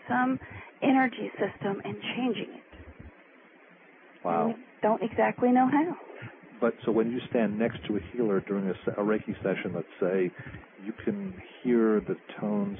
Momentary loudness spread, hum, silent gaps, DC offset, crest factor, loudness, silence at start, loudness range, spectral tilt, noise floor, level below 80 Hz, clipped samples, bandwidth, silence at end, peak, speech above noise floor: 17 LU; none; none; under 0.1%; 16 dB; -29 LUFS; 0.05 s; 5 LU; -10.5 dB/octave; -56 dBFS; -60 dBFS; under 0.1%; 3.8 kHz; 0 s; -14 dBFS; 27 dB